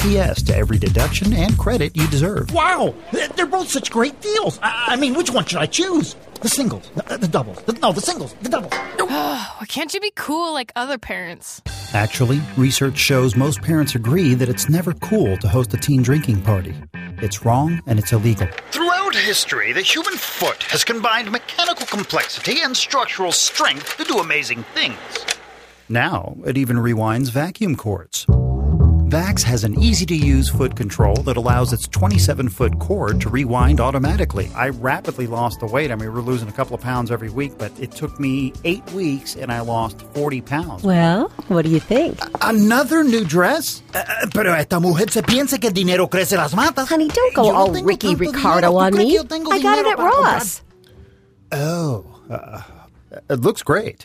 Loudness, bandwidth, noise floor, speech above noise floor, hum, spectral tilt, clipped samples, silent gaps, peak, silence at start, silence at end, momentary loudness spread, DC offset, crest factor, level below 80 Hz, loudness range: -18 LUFS; 15.5 kHz; -48 dBFS; 30 dB; none; -5 dB/octave; under 0.1%; none; 0 dBFS; 0 s; 0 s; 9 LU; under 0.1%; 18 dB; -30 dBFS; 7 LU